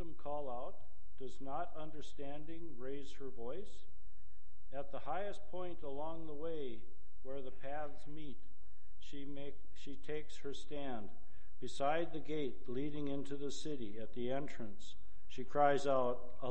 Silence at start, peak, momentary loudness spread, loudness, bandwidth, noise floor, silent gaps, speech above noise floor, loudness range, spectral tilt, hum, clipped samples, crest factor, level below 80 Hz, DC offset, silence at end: 0 s; -16 dBFS; 17 LU; -44 LUFS; 8.8 kHz; -63 dBFS; none; 20 dB; 10 LU; -6 dB/octave; none; under 0.1%; 26 dB; -62 dBFS; 3%; 0 s